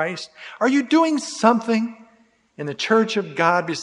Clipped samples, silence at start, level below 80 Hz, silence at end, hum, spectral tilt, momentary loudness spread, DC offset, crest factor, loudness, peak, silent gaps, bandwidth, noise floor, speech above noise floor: under 0.1%; 0 s; -72 dBFS; 0 s; none; -4.5 dB/octave; 14 LU; under 0.1%; 20 dB; -20 LUFS; 0 dBFS; none; 11 kHz; -58 dBFS; 38 dB